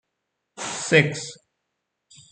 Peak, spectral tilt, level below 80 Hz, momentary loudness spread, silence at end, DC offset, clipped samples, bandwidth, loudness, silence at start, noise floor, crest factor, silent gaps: -2 dBFS; -4 dB/octave; -68 dBFS; 16 LU; 0.95 s; under 0.1%; under 0.1%; 9.4 kHz; -21 LUFS; 0.55 s; -79 dBFS; 24 dB; none